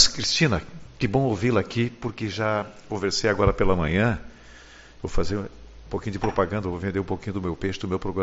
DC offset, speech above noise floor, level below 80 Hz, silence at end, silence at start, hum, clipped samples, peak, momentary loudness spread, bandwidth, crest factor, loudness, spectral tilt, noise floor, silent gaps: under 0.1%; 23 dB; -38 dBFS; 0 s; 0 s; none; under 0.1%; -2 dBFS; 11 LU; 8 kHz; 24 dB; -25 LUFS; -4.5 dB/octave; -47 dBFS; none